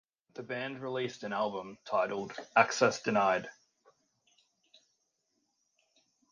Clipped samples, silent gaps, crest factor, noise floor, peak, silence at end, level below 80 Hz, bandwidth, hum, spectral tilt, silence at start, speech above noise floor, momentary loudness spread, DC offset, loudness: under 0.1%; none; 26 dB; -80 dBFS; -10 dBFS; 2.8 s; -78 dBFS; 9.8 kHz; none; -4 dB/octave; 0.35 s; 48 dB; 14 LU; under 0.1%; -32 LUFS